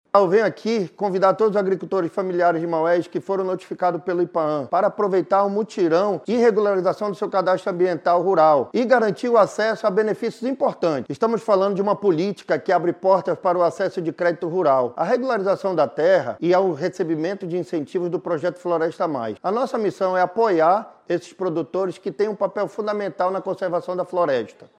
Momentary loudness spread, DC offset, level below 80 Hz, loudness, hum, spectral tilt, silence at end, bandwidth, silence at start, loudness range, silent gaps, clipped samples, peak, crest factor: 7 LU; under 0.1%; -76 dBFS; -21 LUFS; none; -6.5 dB/octave; 0.3 s; 10 kHz; 0.15 s; 4 LU; none; under 0.1%; -2 dBFS; 20 dB